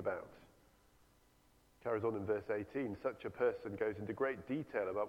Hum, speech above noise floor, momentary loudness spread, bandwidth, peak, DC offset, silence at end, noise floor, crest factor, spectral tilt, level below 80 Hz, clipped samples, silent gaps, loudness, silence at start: none; 31 dB; 5 LU; 15.5 kHz; -24 dBFS; under 0.1%; 0 s; -70 dBFS; 18 dB; -8 dB/octave; -72 dBFS; under 0.1%; none; -40 LUFS; 0 s